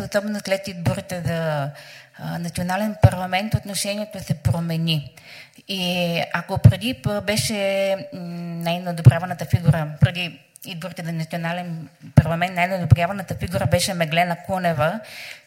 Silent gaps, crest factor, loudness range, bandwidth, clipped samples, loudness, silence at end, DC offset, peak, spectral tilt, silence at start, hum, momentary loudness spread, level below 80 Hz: none; 22 dB; 3 LU; 16.5 kHz; under 0.1%; -22 LUFS; 0.1 s; under 0.1%; 0 dBFS; -5.5 dB/octave; 0 s; none; 15 LU; -42 dBFS